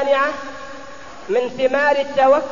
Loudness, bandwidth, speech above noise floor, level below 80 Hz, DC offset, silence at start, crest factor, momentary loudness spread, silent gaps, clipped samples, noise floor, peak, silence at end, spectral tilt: -18 LUFS; 7.4 kHz; 20 dB; -54 dBFS; 1%; 0 s; 14 dB; 20 LU; none; under 0.1%; -37 dBFS; -4 dBFS; 0 s; -4 dB/octave